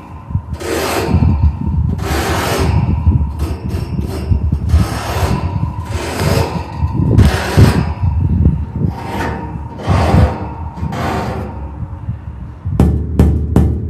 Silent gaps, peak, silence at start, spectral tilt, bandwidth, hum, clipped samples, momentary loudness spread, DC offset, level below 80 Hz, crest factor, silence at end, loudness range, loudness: none; 0 dBFS; 0 s; -6.5 dB/octave; 15 kHz; none; under 0.1%; 12 LU; under 0.1%; -20 dBFS; 14 dB; 0 s; 4 LU; -16 LUFS